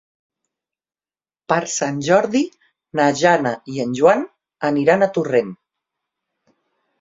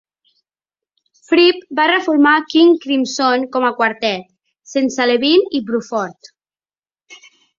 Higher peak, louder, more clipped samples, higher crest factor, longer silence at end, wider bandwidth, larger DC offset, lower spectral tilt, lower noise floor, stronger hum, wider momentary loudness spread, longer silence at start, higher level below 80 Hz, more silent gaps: about the same, -2 dBFS vs 0 dBFS; second, -18 LUFS vs -15 LUFS; neither; about the same, 18 dB vs 16 dB; first, 1.45 s vs 0.45 s; about the same, 7.8 kHz vs 7.6 kHz; neither; first, -5 dB/octave vs -3.5 dB/octave; about the same, under -90 dBFS vs under -90 dBFS; neither; about the same, 9 LU vs 9 LU; first, 1.5 s vs 1.3 s; about the same, -64 dBFS vs -64 dBFS; neither